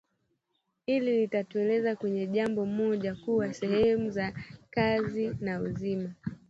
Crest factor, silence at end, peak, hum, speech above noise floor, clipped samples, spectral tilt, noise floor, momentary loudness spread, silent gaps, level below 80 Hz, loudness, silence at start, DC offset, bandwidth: 18 dB; 0.15 s; -12 dBFS; none; 50 dB; under 0.1%; -7.5 dB/octave; -79 dBFS; 8 LU; none; -58 dBFS; -30 LUFS; 0.9 s; under 0.1%; 8 kHz